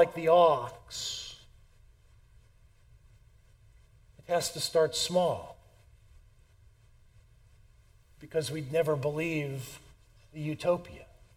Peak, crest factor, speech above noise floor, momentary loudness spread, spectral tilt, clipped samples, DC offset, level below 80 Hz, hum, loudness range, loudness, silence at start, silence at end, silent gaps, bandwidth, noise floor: -10 dBFS; 22 dB; 31 dB; 24 LU; -4 dB/octave; under 0.1%; under 0.1%; -60 dBFS; none; 11 LU; -30 LUFS; 0 s; 0.3 s; none; 16.5 kHz; -60 dBFS